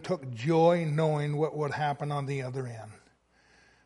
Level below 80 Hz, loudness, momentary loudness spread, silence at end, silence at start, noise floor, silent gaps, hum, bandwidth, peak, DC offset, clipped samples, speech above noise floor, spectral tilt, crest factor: -68 dBFS; -29 LUFS; 14 LU; 0.9 s; 0 s; -65 dBFS; none; none; 11.5 kHz; -12 dBFS; under 0.1%; under 0.1%; 36 dB; -7.5 dB/octave; 18 dB